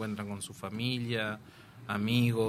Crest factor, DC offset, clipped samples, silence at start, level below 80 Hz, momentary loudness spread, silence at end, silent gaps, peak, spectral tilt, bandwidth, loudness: 18 dB; under 0.1%; under 0.1%; 0 s; -66 dBFS; 16 LU; 0 s; none; -14 dBFS; -5.5 dB/octave; 15 kHz; -33 LUFS